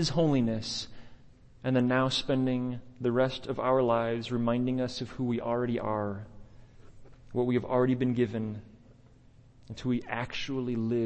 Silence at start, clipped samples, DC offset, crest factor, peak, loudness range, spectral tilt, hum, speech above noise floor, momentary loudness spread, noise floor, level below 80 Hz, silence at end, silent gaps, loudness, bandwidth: 0 s; under 0.1%; under 0.1%; 16 dB; -14 dBFS; 4 LU; -6.5 dB/octave; none; 28 dB; 11 LU; -57 dBFS; -54 dBFS; 0 s; none; -30 LUFS; 8.6 kHz